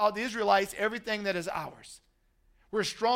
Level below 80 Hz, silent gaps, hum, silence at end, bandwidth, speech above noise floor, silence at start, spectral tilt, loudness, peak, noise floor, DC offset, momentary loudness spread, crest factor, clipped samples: -64 dBFS; none; none; 0 s; 16 kHz; 38 dB; 0 s; -3.5 dB/octave; -30 LUFS; -10 dBFS; -67 dBFS; under 0.1%; 16 LU; 20 dB; under 0.1%